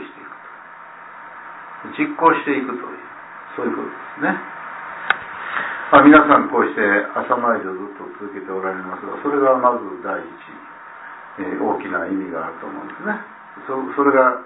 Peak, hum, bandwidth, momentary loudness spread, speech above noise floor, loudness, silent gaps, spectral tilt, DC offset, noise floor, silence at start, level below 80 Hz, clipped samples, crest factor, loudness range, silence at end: 0 dBFS; none; 4 kHz; 22 LU; 21 dB; -18 LUFS; none; -9.5 dB/octave; under 0.1%; -39 dBFS; 0 s; -58 dBFS; under 0.1%; 20 dB; 11 LU; 0 s